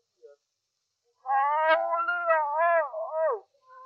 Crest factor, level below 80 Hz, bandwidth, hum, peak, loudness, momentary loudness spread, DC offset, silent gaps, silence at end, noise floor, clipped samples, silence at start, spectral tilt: 18 dB; under -90 dBFS; 5.4 kHz; none; -10 dBFS; -26 LUFS; 7 LU; under 0.1%; none; 0 s; -81 dBFS; under 0.1%; 0.25 s; -1.5 dB/octave